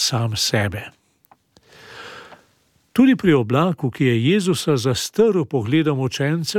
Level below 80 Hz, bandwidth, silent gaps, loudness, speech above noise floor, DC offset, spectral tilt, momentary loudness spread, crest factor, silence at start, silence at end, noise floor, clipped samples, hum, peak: -56 dBFS; 17 kHz; none; -19 LUFS; 43 dB; under 0.1%; -5.5 dB/octave; 17 LU; 18 dB; 0 s; 0 s; -61 dBFS; under 0.1%; none; -2 dBFS